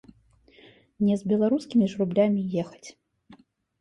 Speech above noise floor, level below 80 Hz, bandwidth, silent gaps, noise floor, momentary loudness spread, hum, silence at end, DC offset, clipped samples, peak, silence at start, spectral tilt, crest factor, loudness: 34 dB; -64 dBFS; 9.8 kHz; none; -58 dBFS; 14 LU; none; 0.45 s; under 0.1%; under 0.1%; -8 dBFS; 1 s; -8 dB/octave; 18 dB; -25 LUFS